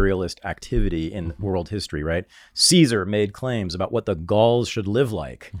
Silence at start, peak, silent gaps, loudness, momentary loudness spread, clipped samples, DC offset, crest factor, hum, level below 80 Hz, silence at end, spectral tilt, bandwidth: 0 s; -4 dBFS; none; -22 LUFS; 12 LU; under 0.1%; under 0.1%; 18 dB; none; -34 dBFS; 0 s; -4.5 dB/octave; 16.5 kHz